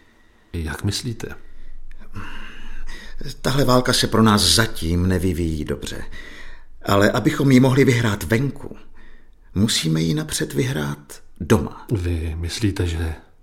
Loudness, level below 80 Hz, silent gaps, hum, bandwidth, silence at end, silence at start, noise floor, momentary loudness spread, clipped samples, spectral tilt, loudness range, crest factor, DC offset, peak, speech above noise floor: -20 LUFS; -34 dBFS; none; none; 16.5 kHz; 0.2 s; 0.55 s; -53 dBFS; 22 LU; under 0.1%; -5 dB/octave; 5 LU; 18 dB; under 0.1%; -2 dBFS; 33 dB